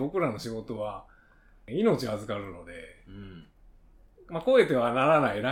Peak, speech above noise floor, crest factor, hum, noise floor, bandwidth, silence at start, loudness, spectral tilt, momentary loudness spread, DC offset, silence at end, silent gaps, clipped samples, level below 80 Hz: -8 dBFS; 30 dB; 20 dB; none; -58 dBFS; 16 kHz; 0 s; -27 LUFS; -6.5 dB/octave; 23 LU; under 0.1%; 0 s; none; under 0.1%; -56 dBFS